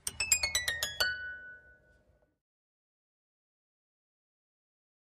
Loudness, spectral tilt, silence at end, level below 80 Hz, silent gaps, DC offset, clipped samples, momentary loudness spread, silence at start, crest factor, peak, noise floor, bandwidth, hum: -30 LUFS; 1 dB/octave; 3.45 s; -60 dBFS; none; under 0.1%; under 0.1%; 18 LU; 0.05 s; 28 dB; -12 dBFS; -69 dBFS; 15 kHz; none